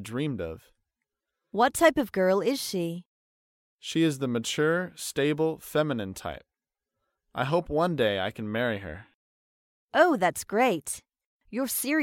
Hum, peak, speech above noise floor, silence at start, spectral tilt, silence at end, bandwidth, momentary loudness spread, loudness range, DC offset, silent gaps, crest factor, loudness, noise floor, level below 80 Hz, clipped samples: none; -8 dBFS; 62 dB; 0 s; -4.5 dB/octave; 0 s; 17 kHz; 15 LU; 3 LU; under 0.1%; 3.06-3.79 s, 9.14-9.88 s, 11.25-11.40 s; 20 dB; -27 LUFS; -88 dBFS; -58 dBFS; under 0.1%